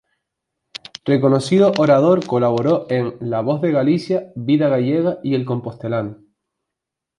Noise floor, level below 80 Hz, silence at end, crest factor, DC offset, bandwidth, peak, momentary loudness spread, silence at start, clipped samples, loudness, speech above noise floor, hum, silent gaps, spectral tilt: -83 dBFS; -60 dBFS; 1.05 s; 16 dB; under 0.1%; 11 kHz; -2 dBFS; 11 LU; 1.05 s; under 0.1%; -18 LUFS; 66 dB; none; none; -7.5 dB/octave